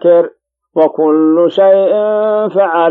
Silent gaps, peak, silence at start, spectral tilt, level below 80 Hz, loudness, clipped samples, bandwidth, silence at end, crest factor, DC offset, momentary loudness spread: none; 0 dBFS; 0.05 s; -8.5 dB/octave; -72 dBFS; -11 LUFS; under 0.1%; 4.2 kHz; 0 s; 10 dB; under 0.1%; 5 LU